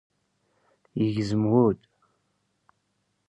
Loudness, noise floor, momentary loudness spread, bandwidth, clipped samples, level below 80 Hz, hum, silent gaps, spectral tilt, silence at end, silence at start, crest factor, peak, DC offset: -25 LUFS; -74 dBFS; 14 LU; 10 kHz; under 0.1%; -60 dBFS; none; none; -8.5 dB/octave; 1.55 s; 0.95 s; 20 dB; -8 dBFS; under 0.1%